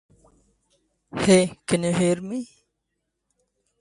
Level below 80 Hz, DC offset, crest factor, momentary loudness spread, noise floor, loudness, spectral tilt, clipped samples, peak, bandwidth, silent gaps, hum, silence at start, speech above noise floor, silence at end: -58 dBFS; under 0.1%; 20 dB; 16 LU; -79 dBFS; -22 LUFS; -5 dB/octave; under 0.1%; -6 dBFS; 11.5 kHz; none; none; 1.15 s; 57 dB; 1.35 s